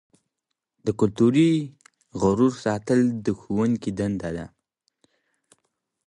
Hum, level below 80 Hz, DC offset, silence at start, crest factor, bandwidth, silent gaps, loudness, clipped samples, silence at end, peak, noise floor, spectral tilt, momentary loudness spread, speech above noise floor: none; -54 dBFS; under 0.1%; 0.85 s; 18 dB; 10.5 kHz; none; -23 LUFS; under 0.1%; 1.6 s; -6 dBFS; -83 dBFS; -7 dB/octave; 14 LU; 61 dB